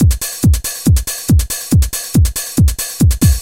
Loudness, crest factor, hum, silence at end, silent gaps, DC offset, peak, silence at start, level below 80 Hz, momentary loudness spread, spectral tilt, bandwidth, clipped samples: -14 LUFS; 12 dB; none; 0 s; none; 0.3%; 0 dBFS; 0 s; -18 dBFS; 2 LU; -5 dB/octave; 17 kHz; under 0.1%